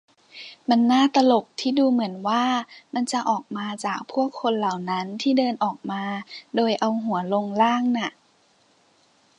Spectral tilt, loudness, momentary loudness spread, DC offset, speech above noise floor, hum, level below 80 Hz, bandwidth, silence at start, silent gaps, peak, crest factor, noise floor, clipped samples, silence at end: -5 dB/octave; -23 LUFS; 11 LU; under 0.1%; 39 dB; none; -78 dBFS; 10.5 kHz; 0.35 s; none; -6 dBFS; 18 dB; -61 dBFS; under 0.1%; 1.3 s